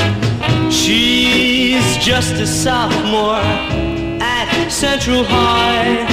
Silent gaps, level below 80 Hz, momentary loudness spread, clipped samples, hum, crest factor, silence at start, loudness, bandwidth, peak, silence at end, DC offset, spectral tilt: none; -32 dBFS; 6 LU; under 0.1%; none; 12 dB; 0 s; -13 LUFS; 16 kHz; -2 dBFS; 0 s; 0.2%; -4 dB/octave